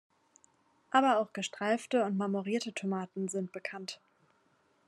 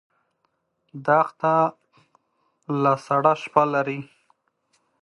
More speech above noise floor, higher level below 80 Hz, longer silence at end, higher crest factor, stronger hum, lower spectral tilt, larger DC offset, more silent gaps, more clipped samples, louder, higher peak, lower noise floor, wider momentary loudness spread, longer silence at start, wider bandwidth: second, 39 dB vs 51 dB; second, -86 dBFS vs -74 dBFS; about the same, 0.9 s vs 1 s; about the same, 22 dB vs 24 dB; neither; second, -5 dB/octave vs -7.5 dB/octave; neither; neither; neither; second, -33 LUFS vs -22 LUFS; second, -12 dBFS vs -2 dBFS; about the same, -71 dBFS vs -73 dBFS; about the same, 12 LU vs 10 LU; about the same, 0.95 s vs 0.95 s; about the same, 12 kHz vs 11 kHz